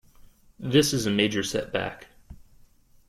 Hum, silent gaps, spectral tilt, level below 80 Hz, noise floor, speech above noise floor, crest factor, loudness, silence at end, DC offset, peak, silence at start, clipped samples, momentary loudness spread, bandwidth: none; none; -4 dB/octave; -54 dBFS; -56 dBFS; 31 dB; 20 dB; -25 LUFS; 0.7 s; under 0.1%; -8 dBFS; 0.6 s; under 0.1%; 15 LU; 16 kHz